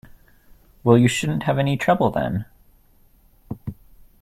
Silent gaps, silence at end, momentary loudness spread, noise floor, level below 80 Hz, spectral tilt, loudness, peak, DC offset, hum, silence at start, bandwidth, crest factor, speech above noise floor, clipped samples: none; 0.5 s; 20 LU; -55 dBFS; -50 dBFS; -6 dB/octave; -20 LUFS; -2 dBFS; under 0.1%; none; 0.85 s; 15 kHz; 22 dB; 36 dB; under 0.1%